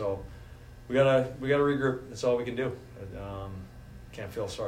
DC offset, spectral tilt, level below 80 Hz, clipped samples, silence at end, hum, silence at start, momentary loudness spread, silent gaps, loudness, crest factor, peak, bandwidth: under 0.1%; -6.5 dB/octave; -52 dBFS; under 0.1%; 0 s; none; 0 s; 23 LU; none; -29 LUFS; 18 dB; -12 dBFS; 16 kHz